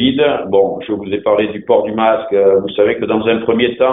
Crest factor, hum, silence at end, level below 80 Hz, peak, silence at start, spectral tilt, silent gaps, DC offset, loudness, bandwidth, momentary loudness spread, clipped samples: 12 dB; none; 0 s; -50 dBFS; 0 dBFS; 0 s; -9 dB/octave; none; 0.1%; -14 LUFS; 4 kHz; 4 LU; under 0.1%